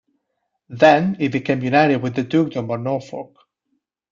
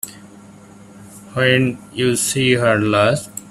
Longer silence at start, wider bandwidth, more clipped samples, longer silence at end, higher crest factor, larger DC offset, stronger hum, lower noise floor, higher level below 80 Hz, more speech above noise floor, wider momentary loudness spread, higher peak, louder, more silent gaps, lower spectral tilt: first, 0.7 s vs 0.05 s; second, 7.4 kHz vs 15.5 kHz; neither; first, 0.85 s vs 0 s; about the same, 18 dB vs 18 dB; neither; neither; first, -75 dBFS vs -42 dBFS; second, -60 dBFS vs -52 dBFS; first, 57 dB vs 25 dB; first, 15 LU vs 9 LU; about the same, -2 dBFS vs -2 dBFS; about the same, -18 LUFS vs -17 LUFS; neither; first, -7 dB/octave vs -4.5 dB/octave